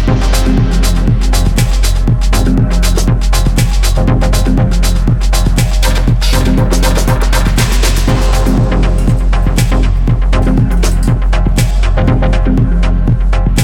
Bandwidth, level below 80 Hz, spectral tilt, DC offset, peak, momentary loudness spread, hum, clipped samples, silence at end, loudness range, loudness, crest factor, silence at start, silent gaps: 15.5 kHz; -10 dBFS; -5.5 dB/octave; under 0.1%; 0 dBFS; 1 LU; none; under 0.1%; 0 s; 1 LU; -12 LUFS; 8 dB; 0 s; none